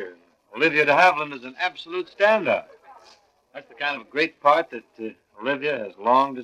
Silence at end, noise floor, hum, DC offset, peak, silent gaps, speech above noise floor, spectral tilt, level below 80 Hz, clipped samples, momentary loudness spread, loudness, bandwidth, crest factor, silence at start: 0 s; -56 dBFS; none; under 0.1%; -4 dBFS; none; 33 dB; -4.5 dB/octave; -76 dBFS; under 0.1%; 19 LU; -22 LUFS; 12.5 kHz; 20 dB; 0 s